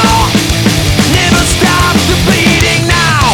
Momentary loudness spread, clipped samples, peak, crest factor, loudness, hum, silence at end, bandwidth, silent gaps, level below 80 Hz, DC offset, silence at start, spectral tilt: 2 LU; under 0.1%; 0 dBFS; 8 dB; -8 LUFS; none; 0 s; over 20 kHz; none; -20 dBFS; under 0.1%; 0 s; -4 dB/octave